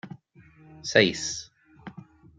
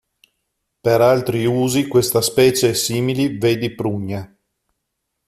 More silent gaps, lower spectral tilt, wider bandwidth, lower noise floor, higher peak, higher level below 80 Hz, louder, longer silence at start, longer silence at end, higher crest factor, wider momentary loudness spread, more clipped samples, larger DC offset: neither; second, -3 dB/octave vs -5 dB/octave; second, 9.4 kHz vs 15 kHz; second, -55 dBFS vs -76 dBFS; about the same, -4 dBFS vs -2 dBFS; second, -62 dBFS vs -54 dBFS; second, -25 LUFS vs -17 LUFS; second, 0.05 s vs 0.85 s; second, 0.35 s vs 1.05 s; first, 26 dB vs 16 dB; first, 25 LU vs 9 LU; neither; neither